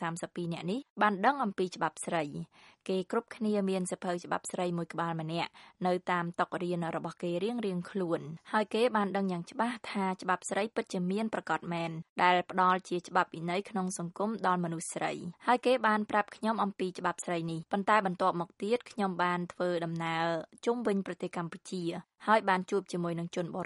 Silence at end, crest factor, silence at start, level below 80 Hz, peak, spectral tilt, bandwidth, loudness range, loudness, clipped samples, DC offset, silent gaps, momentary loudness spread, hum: 0 s; 22 dB; 0 s; -78 dBFS; -10 dBFS; -5.5 dB/octave; 11.5 kHz; 3 LU; -32 LUFS; under 0.1%; under 0.1%; 0.90-0.96 s, 12.09-12.16 s; 9 LU; none